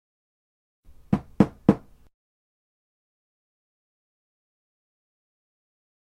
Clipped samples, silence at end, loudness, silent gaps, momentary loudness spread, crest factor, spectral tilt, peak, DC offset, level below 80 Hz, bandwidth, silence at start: under 0.1%; 4.25 s; -24 LUFS; none; 8 LU; 30 dB; -9.5 dB/octave; -2 dBFS; under 0.1%; -54 dBFS; 9.2 kHz; 1.1 s